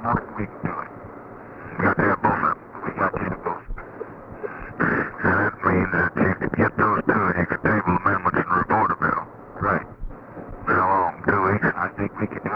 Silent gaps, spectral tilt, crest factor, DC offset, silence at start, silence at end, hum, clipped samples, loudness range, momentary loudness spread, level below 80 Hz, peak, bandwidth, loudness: none; -10.5 dB/octave; 18 dB; under 0.1%; 0 s; 0 s; none; under 0.1%; 4 LU; 18 LU; -44 dBFS; -6 dBFS; 5.6 kHz; -22 LUFS